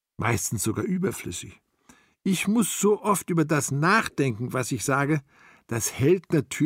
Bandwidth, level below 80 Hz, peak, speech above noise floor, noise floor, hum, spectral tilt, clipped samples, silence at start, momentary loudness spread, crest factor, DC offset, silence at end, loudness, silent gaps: 16 kHz; -58 dBFS; -8 dBFS; 34 dB; -59 dBFS; none; -5 dB/octave; under 0.1%; 0.2 s; 9 LU; 18 dB; under 0.1%; 0 s; -25 LUFS; none